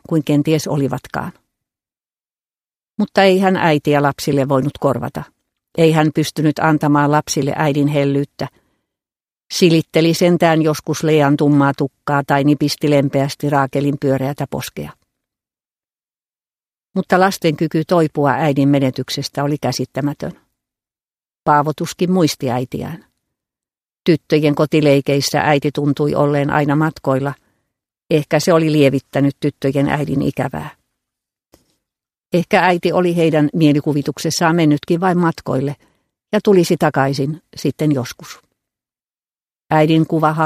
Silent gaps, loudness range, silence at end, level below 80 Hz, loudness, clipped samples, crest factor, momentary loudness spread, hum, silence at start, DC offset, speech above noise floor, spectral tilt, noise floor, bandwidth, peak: 16.26-16.30 s; 5 LU; 0 s; -52 dBFS; -16 LUFS; under 0.1%; 16 dB; 11 LU; none; 0.1 s; under 0.1%; over 75 dB; -6 dB/octave; under -90 dBFS; 15.5 kHz; 0 dBFS